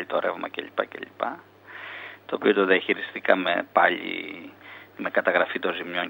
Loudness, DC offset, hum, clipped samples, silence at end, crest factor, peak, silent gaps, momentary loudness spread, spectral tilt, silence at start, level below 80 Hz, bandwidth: -25 LUFS; under 0.1%; none; under 0.1%; 0 s; 24 dB; -2 dBFS; none; 19 LU; -6.5 dB/octave; 0 s; -78 dBFS; 16 kHz